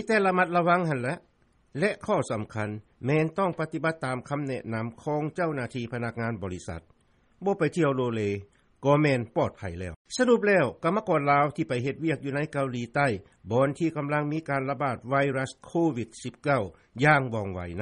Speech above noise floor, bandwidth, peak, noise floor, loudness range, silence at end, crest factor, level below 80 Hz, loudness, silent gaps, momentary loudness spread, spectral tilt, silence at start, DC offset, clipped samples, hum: 31 dB; 11 kHz; -8 dBFS; -58 dBFS; 5 LU; 0 s; 20 dB; -60 dBFS; -27 LUFS; 9.96-10.05 s; 12 LU; -6.5 dB/octave; 0 s; under 0.1%; under 0.1%; none